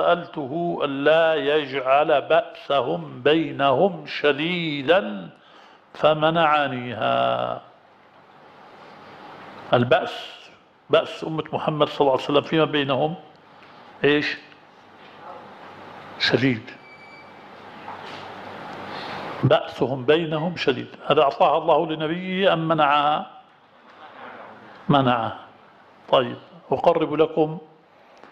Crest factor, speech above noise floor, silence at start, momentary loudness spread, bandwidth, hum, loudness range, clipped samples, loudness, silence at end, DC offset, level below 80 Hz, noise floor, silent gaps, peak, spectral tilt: 20 dB; 31 dB; 0 s; 22 LU; 8.6 kHz; none; 7 LU; under 0.1%; -21 LUFS; 0.65 s; under 0.1%; -62 dBFS; -52 dBFS; none; -4 dBFS; -6.5 dB/octave